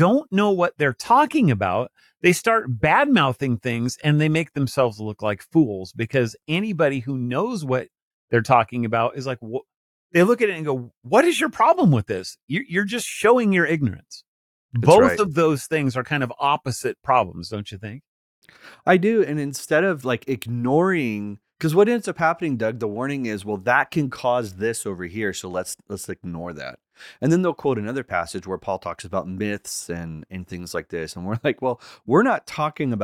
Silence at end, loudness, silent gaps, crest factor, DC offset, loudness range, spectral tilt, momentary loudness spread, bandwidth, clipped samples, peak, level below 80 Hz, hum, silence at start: 0 s; -22 LUFS; 8.02-8.28 s, 9.76-10.10 s, 10.97-11.01 s, 12.42-12.48 s, 14.27-14.69 s, 18.08-18.42 s; 20 dB; under 0.1%; 7 LU; -6 dB/octave; 13 LU; 16.5 kHz; under 0.1%; -2 dBFS; -58 dBFS; none; 0 s